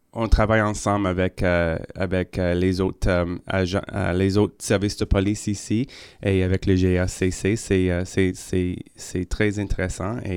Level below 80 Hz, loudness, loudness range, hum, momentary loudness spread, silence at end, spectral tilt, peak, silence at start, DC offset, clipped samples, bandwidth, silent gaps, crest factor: -32 dBFS; -23 LUFS; 1 LU; none; 7 LU; 0 s; -6 dB/octave; -4 dBFS; 0.15 s; under 0.1%; under 0.1%; 14.5 kHz; none; 18 dB